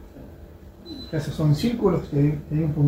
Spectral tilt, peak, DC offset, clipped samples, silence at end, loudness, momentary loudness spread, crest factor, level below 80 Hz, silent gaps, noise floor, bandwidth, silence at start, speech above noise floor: -8 dB/octave; -8 dBFS; under 0.1%; under 0.1%; 0 s; -23 LUFS; 22 LU; 14 dB; -44 dBFS; none; -44 dBFS; 15.5 kHz; 0 s; 22 dB